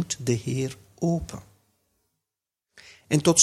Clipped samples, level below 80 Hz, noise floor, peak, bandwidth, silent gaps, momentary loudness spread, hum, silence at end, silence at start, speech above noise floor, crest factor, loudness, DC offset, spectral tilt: under 0.1%; -52 dBFS; -87 dBFS; -2 dBFS; 14.5 kHz; none; 13 LU; none; 0 s; 0 s; 64 dB; 24 dB; -26 LUFS; under 0.1%; -4 dB/octave